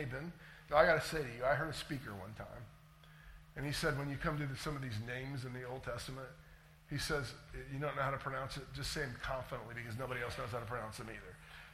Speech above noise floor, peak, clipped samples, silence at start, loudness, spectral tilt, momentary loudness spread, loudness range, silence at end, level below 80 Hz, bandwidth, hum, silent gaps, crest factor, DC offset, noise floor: 20 dB; -14 dBFS; under 0.1%; 0 s; -40 LUFS; -5 dB/octave; 16 LU; 6 LU; 0 s; -56 dBFS; 16 kHz; none; none; 26 dB; under 0.1%; -60 dBFS